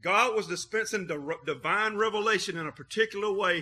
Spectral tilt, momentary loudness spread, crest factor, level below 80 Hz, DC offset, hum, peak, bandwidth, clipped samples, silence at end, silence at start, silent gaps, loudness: -3 dB/octave; 9 LU; 18 dB; -70 dBFS; under 0.1%; none; -10 dBFS; 14 kHz; under 0.1%; 0 s; 0.05 s; none; -29 LUFS